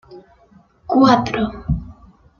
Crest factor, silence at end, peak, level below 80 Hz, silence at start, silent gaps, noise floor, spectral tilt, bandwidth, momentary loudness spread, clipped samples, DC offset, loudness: 18 dB; 0.5 s; -2 dBFS; -36 dBFS; 0.1 s; none; -52 dBFS; -6.5 dB/octave; 7 kHz; 12 LU; under 0.1%; under 0.1%; -17 LUFS